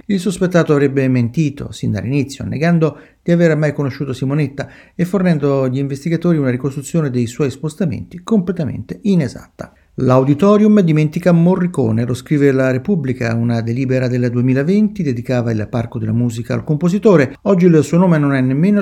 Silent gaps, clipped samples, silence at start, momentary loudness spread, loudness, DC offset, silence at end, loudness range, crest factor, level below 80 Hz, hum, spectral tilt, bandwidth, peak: none; under 0.1%; 0.1 s; 10 LU; -15 LUFS; under 0.1%; 0 s; 4 LU; 14 dB; -46 dBFS; none; -8 dB/octave; 13 kHz; 0 dBFS